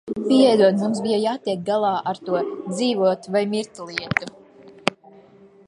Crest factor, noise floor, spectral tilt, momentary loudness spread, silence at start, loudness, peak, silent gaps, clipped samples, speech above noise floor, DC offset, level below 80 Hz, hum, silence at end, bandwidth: 22 dB; -49 dBFS; -5.5 dB/octave; 11 LU; 0.05 s; -21 LUFS; 0 dBFS; none; under 0.1%; 29 dB; under 0.1%; -62 dBFS; none; 0.75 s; 11.5 kHz